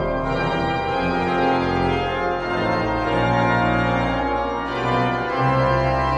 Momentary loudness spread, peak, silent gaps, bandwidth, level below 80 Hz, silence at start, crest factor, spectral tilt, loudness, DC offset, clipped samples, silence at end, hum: 4 LU; -6 dBFS; none; 10 kHz; -36 dBFS; 0 s; 14 dB; -7 dB/octave; -21 LUFS; under 0.1%; under 0.1%; 0 s; none